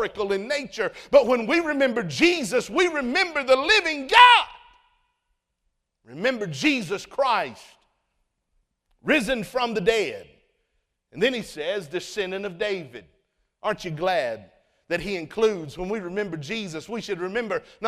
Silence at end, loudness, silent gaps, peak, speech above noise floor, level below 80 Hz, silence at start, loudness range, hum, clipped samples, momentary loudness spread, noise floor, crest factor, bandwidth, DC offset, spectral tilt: 0 s; -23 LUFS; none; 0 dBFS; 53 dB; -56 dBFS; 0 s; 10 LU; none; under 0.1%; 12 LU; -76 dBFS; 24 dB; 15 kHz; under 0.1%; -3.5 dB/octave